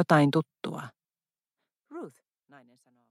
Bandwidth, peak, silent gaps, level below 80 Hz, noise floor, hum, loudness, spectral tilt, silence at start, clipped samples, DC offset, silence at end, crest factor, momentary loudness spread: 14 kHz; -8 dBFS; none; -76 dBFS; under -90 dBFS; none; -27 LUFS; -7 dB/octave; 0 s; under 0.1%; under 0.1%; 1 s; 24 dB; 24 LU